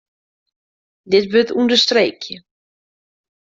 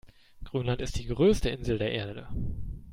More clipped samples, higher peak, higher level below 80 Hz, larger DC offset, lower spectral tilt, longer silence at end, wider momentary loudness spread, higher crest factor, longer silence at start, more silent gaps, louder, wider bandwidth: neither; first, -2 dBFS vs -12 dBFS; second, -62 dBFS vs -40 dBFS; neither; second, -3.5 dB/octave vs -6 dB/octave; first, 1.05 s vs 0 s; first, 18 LU vs 13 LU; about the same, 18 dB vs 16 dB; first, 1.05 s vs 0.05 s; neither; first, -15 LUFS vs -30 LUFS; second, 7.8 kHz vs 16 kHz